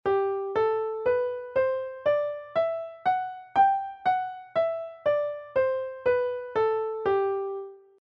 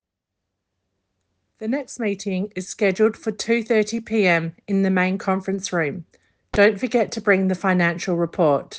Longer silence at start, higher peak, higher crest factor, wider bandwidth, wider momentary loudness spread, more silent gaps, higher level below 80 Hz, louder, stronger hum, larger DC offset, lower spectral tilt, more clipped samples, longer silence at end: second, 0.05 s vs 1.6 s; second, -12 dBFS vs -4 dBFS; about the same, 16 dB vs 18 dB; second, 5.8 kHz vs 9.6 kHz; second, 5 LU vs 8 LU; neither; second, -64 dBFS vs -54 dBFS; second, -27 LUFS vs -21 LUFS; neither; neither; first, -7 dB/octave vs -5.5 dB/octave; neither; first, 0.25 s vs 0 s